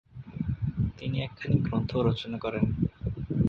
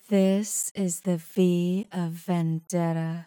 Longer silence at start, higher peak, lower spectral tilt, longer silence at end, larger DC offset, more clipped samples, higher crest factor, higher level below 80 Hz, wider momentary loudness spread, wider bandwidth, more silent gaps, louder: about the same, 0.15 s vs 0.1 s; about the same, -12 dBFS vs -10 dBFS; first, -9 dB/octave vs -6 dB/octave; about the same, 0 s vs 0.05 s; neither; neither; about the same, 18 dB vs 14 dB; first, -42 dBFS vs -80 dBFS; about the same, 7 LU vs 6 LU; second, 6.6 kHz vs 19 kHz; second, none vs 0.71-0.75 s; second, -30 LUFS vs -26 LUFS